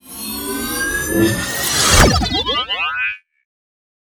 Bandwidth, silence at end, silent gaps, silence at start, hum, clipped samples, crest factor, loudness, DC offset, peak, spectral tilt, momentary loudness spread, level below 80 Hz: over 20 kHz; 1 s; none; 0.05 s; none; under 0.1%; 18 dB; -16 LUFS; under 0.1%; 0 dBFS; -3 dB/octave; 12 LU; -26 dBFS